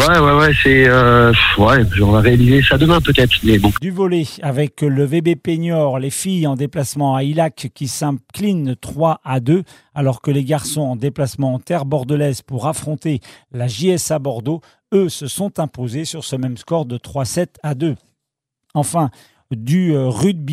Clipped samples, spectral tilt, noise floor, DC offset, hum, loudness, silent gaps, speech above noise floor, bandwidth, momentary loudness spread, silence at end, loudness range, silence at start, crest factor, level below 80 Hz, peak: under 0.1%; -5.5 dB/octave; -79 dBFS; under 0.1%; none; -16 LUFS; none; 64 dB; 16 kHz; 13 LU; 0 s; 10 LU; 0 s; 14 dB; -34 dBFS; 0 dBFS